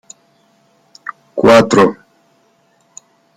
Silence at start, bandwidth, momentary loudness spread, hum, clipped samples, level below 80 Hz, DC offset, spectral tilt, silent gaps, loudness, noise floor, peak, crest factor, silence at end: 1.05 s; 15.5 kHz; 23 LU; none; under 0.1%; -52 dBFS; under 0.1%; -5 dB/octave; none; -11 LUFS; -56 dBFS; 0 dBFS; 16 dB; 1.45 s